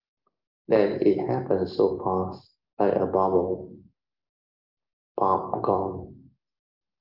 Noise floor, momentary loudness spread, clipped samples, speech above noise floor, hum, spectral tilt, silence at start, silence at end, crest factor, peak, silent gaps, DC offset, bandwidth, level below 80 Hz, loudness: -52 dBFS; 12 LU; under 0.1%; 28 dB; none; -10 dB/octave; 0.7 s; 0.85 s; 18 dB; -8 dBFS; 2.73-2.77 s, 4.29-4.77 s, 4.93-5.15 s; under 0.1%; 5.8 kHz; -64 dBFS; -25 LUFS